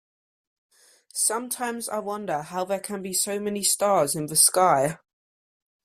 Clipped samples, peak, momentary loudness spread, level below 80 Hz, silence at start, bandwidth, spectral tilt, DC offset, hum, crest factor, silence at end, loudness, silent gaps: under 0.1%; -4 dBFS; 12 LU; -68 dBFS; 1.15 s; 16 kHz; -2.5 dB/octave; under 0.1%; none; 22 dB; 0.9 s; -23 LUFS; none